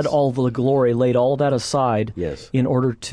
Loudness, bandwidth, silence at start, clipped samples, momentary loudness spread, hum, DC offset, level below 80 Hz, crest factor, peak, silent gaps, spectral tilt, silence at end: -20 LUFS; 10.5 kHz; 0 s; under 0.1%; 6 LU; none; under 0.1%; -48 dBFS; 12 dB; -8 dBFS; none; -6.5 dB/octave; 0 s